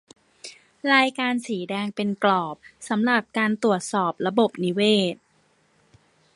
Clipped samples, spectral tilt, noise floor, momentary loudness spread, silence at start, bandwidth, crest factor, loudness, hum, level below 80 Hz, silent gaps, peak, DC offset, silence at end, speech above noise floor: under 0.1%; -4.5 dB/octave; -63 dBFS; 20 LU; 0.45 s; 11.5 kHz; 22 dB; -23 LUFS; none; -70 dBFS; none; -2 dBFS; under 0.1%; 1.2 s; 41 dB